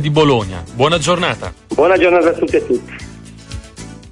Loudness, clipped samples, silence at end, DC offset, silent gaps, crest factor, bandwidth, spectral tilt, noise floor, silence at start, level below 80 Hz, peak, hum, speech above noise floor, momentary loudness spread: -14 LUFS; under 0.1%; 0.05 s; under 0.1%; none; 14 dB; 11.5 kHz; -5.5 dB/octave; -34 dBFS; 0 s; -38 dBFS; -2 dBFS; none; 20 dB; 21 LU